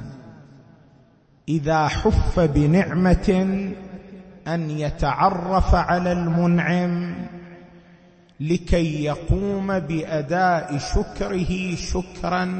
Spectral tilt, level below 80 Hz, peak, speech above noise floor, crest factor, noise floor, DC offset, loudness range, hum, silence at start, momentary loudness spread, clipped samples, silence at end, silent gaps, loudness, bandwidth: -7 dB/octave; -30 dBFS; -4 dBFS; 34 dB; 18 dB; -55 dBFS; under 0.1%; 3 LU; none; 0 s; 14 LU; under 0.1%; 0 s; none; -22 LUFS; 8.6 kHz